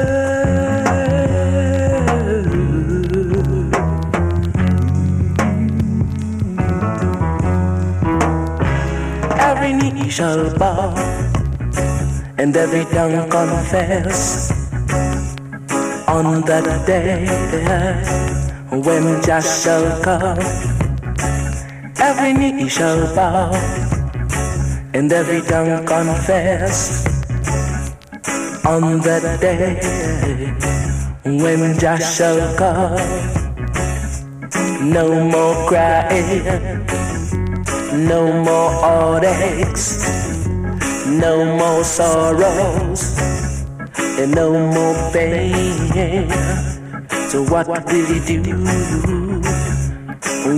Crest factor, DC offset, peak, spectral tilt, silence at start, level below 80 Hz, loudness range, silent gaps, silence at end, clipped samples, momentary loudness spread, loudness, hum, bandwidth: 16 dB; under 0.1%; 0 dBFS; -5.5 dB/octave; 0 s; -28 dBFS; 2 LU; none; 0 s; under 0.1%; 7 LU; -17 LUFS; none; 15.5 kHz